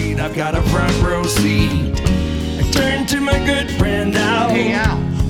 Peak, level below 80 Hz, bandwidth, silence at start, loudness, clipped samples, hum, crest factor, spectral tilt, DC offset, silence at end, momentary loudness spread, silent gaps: -2 dBFS; -24 dBFS; 18 kHz; 0 s; -17 LUFS; under 0.1%; none; 14 dB; -5 dB/octave; 0.2%; 0 s; 4 LU; none